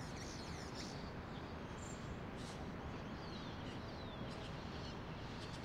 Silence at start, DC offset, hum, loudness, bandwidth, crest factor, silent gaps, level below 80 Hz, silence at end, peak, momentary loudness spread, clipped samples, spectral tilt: 0 s; under 0.1%; none; -48 LUFS; 16 kHz; 14 dB; none; -58 dBFS; 0 s; -34 dBFS; 1 LU; under 0.1%; -5 dB/octave